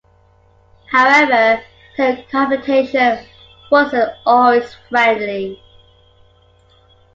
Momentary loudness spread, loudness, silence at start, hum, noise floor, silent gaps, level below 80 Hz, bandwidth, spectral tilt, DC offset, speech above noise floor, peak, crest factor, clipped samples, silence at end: 11 LU; -14 LUFS; 0.9 s; none; -52 dBFS; none; -54 dBFS; 7.8 kHz; -4.5 dB/octave; under 0.1%; 38 dB; 0 dBFS; 16 dB; under 0.1%; 1.6 s